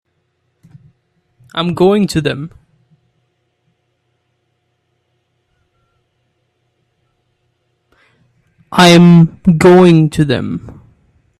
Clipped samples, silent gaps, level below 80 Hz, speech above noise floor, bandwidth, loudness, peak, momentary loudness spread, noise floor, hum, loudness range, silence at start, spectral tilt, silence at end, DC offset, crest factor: under 0.1%; none; -46 dBFS; 56 dB; 13 kHz; -10 LUFS; 0 dBFS; 18 LU; -65 dBFS; none; 12 LU; 1.55 s; -6.5 dB/octave; 0.7 s; under 0.1%; 14 dB